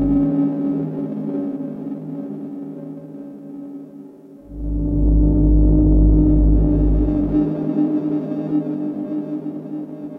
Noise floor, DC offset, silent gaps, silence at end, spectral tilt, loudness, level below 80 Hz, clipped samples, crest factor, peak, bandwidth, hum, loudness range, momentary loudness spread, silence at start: -40 dBFS; under 0.1%; none; 0 s; -12.5 dB/octave; -19 LUFS; -22 dBFS; under 0.1%; 12 dB; -6 dBFS; 2.2 kHz; none; 13 LU; 19 LU; 0 s